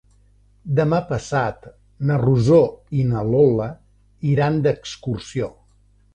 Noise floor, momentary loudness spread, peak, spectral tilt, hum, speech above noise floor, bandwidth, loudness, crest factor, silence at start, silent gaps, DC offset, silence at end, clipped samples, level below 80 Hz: -56 dBFS; 12 LU; -4 dBFS; -8 dB/octave; 50 Hz at -45 dBFS; 37 dB; 9.2 kHz; -20 LUFS; 16 dB; 0.65 s; none; under 0.1%; 0.65 s; under 0.1%; -46 dBFS